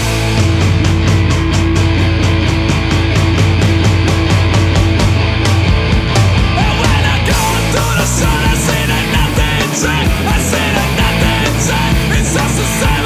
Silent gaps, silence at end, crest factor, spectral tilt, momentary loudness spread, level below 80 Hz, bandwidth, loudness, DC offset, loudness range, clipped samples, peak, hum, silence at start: none; 0 s; 10 dB; -5 dB/octave; 2 LU; -18 dBFS; 16 kHz; -12 LUFS; under 0.1%; 1 LU; under 0.1%; 0 dBFS; none; 0 s